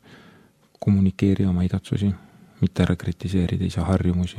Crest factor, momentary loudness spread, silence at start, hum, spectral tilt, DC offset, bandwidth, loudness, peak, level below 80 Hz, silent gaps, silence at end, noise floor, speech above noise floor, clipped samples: 18 dB; 6 LU; 0.1 s; none; -8 dB/octave; under 0.1%; 10.5 kHz; -23 LUFS; -4 dBFS; -42 dBFS; none; 0 s; -55 dBFS; 34 dB; under 0.1%